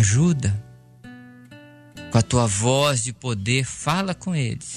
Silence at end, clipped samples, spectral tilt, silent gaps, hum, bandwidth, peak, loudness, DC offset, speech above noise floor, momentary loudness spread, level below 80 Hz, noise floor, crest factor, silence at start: 0 s; under 0.1%; -4.5 dB/octave; none; none; 13.5 kHz; -4 dBFS; -22 LUFS; under 0.1%; 24 dB; 8 LU; -48 dBFS; -46 dBFS; 18 dB; 0 s